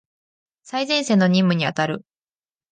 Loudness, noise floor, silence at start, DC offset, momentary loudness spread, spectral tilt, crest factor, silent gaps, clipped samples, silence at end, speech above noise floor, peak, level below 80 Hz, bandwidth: -20 LUFS; under -90 dBFS; 0.65 s; under 0.1%; 11 LU; -5.5 dB/octave; 16 dB; none; under 0.1%; 0.7 s; over 71 dB; -6 dBFS; -68 dBFS; 9.6 kHz